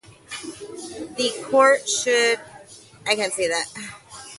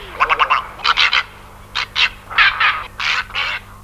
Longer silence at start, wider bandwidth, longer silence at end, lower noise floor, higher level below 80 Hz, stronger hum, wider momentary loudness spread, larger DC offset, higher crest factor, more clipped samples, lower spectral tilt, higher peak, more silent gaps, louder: first, 0.3 s vs 0 s; second, 11.5 kHz vs 16 kHz; about the same, 0 s vs 0 s; first, -46 dBFS vs -38 dBFS; second, -64 dBFS vs -42 dBFS; neither; first, 19 LU vs 9 LU; neither; about the same, 20 dB vs 18 dB; neither; about the same, -1 dB/octave vs -0.5 dB/octave; about the same, -2 dBFS vs 0 dBFS; neither; second, -21 LUFS vs -16 LUFS